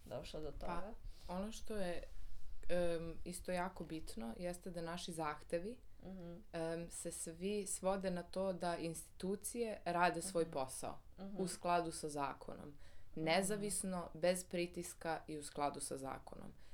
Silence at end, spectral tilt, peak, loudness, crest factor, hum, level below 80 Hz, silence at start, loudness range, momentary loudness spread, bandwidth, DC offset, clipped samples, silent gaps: 0 s; -4 dB/octave; -20 dBFS; -43 LUFS; 22 dB; none; -58 dBFS; 0 s; 5 LU; 15 LU; 19.5 kHz; under 0.1%; under 0.1%; none